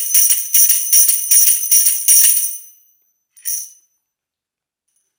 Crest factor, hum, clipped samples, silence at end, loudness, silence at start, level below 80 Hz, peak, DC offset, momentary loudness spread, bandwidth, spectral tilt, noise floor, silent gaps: 16 dB; none; under 0.1%; 1.5 s; -9 LUFS; 0 s; -78 dBFS; 0 dBFS; under 0.1%; 14 LU; over 20 kHz; 7 dB/octave; -86 dBFS; none